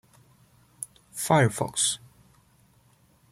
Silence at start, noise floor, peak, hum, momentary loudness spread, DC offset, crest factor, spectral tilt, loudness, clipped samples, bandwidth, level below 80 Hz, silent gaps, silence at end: 0.8 s; -62 dBFS; -8 dBFS; none; 18 LU; under 0.1%; 22 dB; -3.5 dB/octave; -25 LUFS; under 0.1%; 16 kHz; -64 dBFS; none; 1.35 s